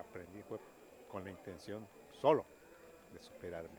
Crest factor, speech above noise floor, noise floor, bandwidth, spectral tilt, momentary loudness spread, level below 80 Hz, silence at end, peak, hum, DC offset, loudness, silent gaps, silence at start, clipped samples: 26 dB; 20 dB; -60 dBFS; over 20 kHz; -6 dB/octave; 26 LU; -74 dBFS; 0 s; -16 dBFS; none; under 0.1%; -41 LUFS; none; 0 s; under 0.1%